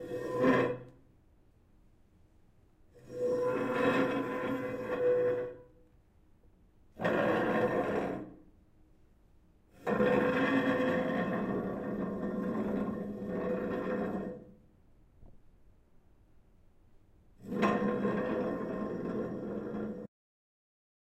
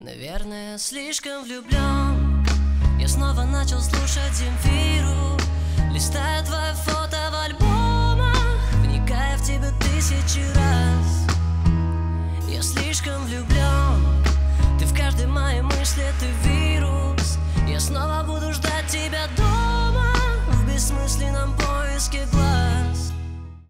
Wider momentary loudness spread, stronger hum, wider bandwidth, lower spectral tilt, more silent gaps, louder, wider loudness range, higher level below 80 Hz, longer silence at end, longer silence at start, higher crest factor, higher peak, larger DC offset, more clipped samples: first, 12 LU vs 6 LU; neither; second, 14 kHz vs 16 kHz; first, -7.5 dB/octave vs -4.5 dB/octave; neither; second, -33 LUFS vs -22 LUFS; first, 7 LU vs 2 LU; second, -62 dBFS vs -22 dBFS; first, 1 s vs 0.1 s; about the same, 0 s vs 0 s; about the same, 20 dB vs 16 dB; second, -14 dBFS vs -4 dBFS; neither; neither